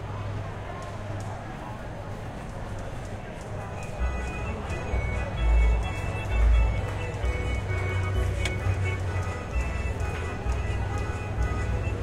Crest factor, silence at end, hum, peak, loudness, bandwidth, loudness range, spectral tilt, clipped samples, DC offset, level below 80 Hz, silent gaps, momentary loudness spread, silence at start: 16 dB; 0 s; none; -12 dBFS; -30 LUFS; 11 kHz; 9 LU; -6 dB/octave; under 0.1%; under 0.1%; -30 dBFS; none; 12 LU; 0 s